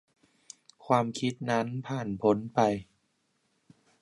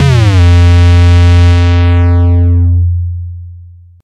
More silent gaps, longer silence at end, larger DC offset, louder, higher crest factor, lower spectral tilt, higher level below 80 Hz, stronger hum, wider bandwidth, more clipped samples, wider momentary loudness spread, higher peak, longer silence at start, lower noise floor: neither; first, 1.2 s vs 0.4 s; neither; second, -29 LUFS vs -7 LUFS; first, 22 dB vs 6 dB; about the same, -6 dB/octave vs -7 dB/octave; second, -66 dBFS vs -16 dBFS; neither; first, 11.5 kHz vs 7.8 kHz; neither; first, 18 LU vs 12 LU; second, -8 dBFS vs 0 dBFS; first, 0.85 s vs 0 s; first, -75 dBFS vs -33 dBFS